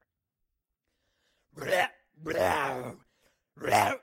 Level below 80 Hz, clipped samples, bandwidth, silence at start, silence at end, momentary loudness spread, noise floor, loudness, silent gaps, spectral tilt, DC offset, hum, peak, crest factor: -66 dBFS; under 0.1%; 16.5 kHz; 1.55 s; 0.05 s; 15 LU; -83 dBFS; -29 LUFS; none; -3.5 dB/octave; under 0.1%; none; -10 dBFS; 22 dB